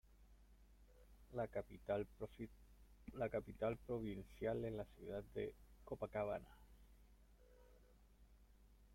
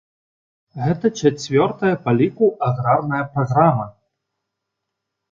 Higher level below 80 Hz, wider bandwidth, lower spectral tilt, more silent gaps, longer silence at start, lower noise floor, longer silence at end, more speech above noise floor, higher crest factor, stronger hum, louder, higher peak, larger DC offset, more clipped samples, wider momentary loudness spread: second, -64 dBFS vs -54 dBFS; first, 16.5 kHz vs 7.6 kHz; about the same, -8 dB/octave vs -7 dB/octave; neither; second, 0.1 s vs 0.75 s; second, -68 dBFS vs -80 dBFS; second, 0 s vs 1.4 s; second, 22 dB vs 62 dB; about the same, 20 dB vs 18 dB; first, 60 Hz at -70 dBFS vs none; second, -48 LUFS vs -19 LUFS; second, -30 dBFS vs -2 dBFS; neither; neither; first, 12 LU vs 8 LU